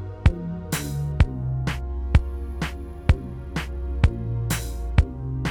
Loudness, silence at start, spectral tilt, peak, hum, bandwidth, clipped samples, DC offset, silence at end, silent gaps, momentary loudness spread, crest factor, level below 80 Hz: -26 LUFS; 0 s; -6 dB/octave; -6 dBFS; none; 17.5 kHz; under 0.1%; under 0.1%; 0 s; none; 8 LU; 18 dB; -26 dBFS